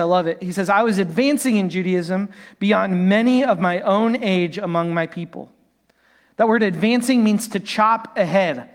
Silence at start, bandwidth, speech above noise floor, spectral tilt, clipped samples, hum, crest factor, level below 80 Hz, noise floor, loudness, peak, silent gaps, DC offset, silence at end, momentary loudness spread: 0 s; 16.5 kHz; 42 dB; -6 dB/octave; under 0.1%; none; 16 dB; -66 dBFS; -61 dBFS; -19 LUFS; -4 dBFS; none; under 0.1%; 0.1 s; 8 LU